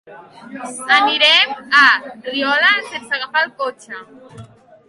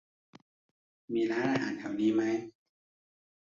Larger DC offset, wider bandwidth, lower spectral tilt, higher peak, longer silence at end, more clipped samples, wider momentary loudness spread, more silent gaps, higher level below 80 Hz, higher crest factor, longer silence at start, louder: neither; first, 11.5 kHz vs 7.4 kHz; second, -1 dB/octave vs -6 dB/octave; first, 0 dBFS vs -18 dBFS; second, 0.45 s vs 0.95 s; neither; first, 22 LU vs 8 LU; neither; first, -66 dBFS vs -74 dBFS; about the same, 18 dB vs 16 dB; second, 0.1 s vs 1.1 s; first, -14 LUFS vs -31 LUFS